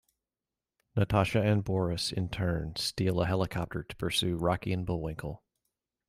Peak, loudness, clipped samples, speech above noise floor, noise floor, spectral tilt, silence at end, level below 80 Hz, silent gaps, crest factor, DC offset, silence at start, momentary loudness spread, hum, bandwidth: -14 dBFS; -31 LUFS; under 0.1%; over 60 dB; under -90 dBFS; -5.5 dB/octave; 0.75 s; -50 dBFS; none; 18 dB; under 0.1%; 0.95 s; 10 LU; none; 15.5 kHz